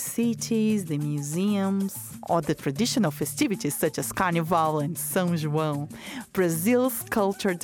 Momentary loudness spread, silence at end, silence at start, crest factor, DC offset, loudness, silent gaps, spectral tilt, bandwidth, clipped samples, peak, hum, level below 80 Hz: 5 LU; 0 s; 0 s; 16 dB; under 0.1%; -26 LUFS; none; -5 dB/octave; 19.5 kHz; under 0.1%; -10 dBFS; none; -60 dBFS